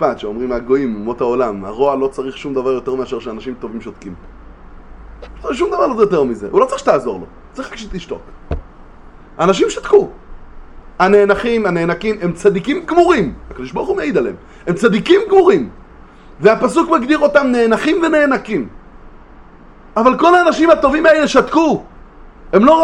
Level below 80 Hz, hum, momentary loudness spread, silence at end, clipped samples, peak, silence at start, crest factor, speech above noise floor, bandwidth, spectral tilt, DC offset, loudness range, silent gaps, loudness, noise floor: -38 dBFS; none; 17 LU; 0 s; under 0.1%; 0 dBFS; 0 s; 14 dB; 26 dB; 10.5 kHz; -5.5 dB/octave; under 0.1%; 7 LU; none; -14 LUFS; -39 dBFS